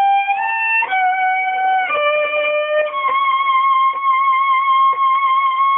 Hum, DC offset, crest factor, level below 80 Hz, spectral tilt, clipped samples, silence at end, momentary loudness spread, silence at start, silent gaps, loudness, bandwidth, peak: none; under 0.1%; 8 dB; -74 dBFS; -4.5 dB/octave; under 0.1%; 0 s; 3 LU; 0 s; none; -15 LUFS; 3.8 kHz; -8 dBFS